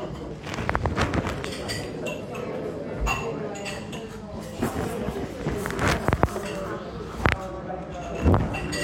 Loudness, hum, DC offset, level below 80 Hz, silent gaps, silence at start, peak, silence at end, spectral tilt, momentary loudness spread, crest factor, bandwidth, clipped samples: -28 LUFS; none; under 0.1%; -38 dBFS; none; 0 s; 0 dBFS; 0 s; -5.5 dB/octave; 11 LU; 28 dB; 17 kHz; under 0.1%